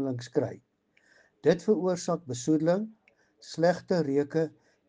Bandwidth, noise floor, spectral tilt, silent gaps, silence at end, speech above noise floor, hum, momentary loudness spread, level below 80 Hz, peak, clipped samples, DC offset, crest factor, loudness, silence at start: 9.8 kHz; -65 dBFS; -6.5 dB/octave; none; 0.4 s; 38 dB; none; 8 LU; -70 dBFS; -8 dBFS; under 0.1%; under 0.1%; 20 dB; -28 LUFS; 0 s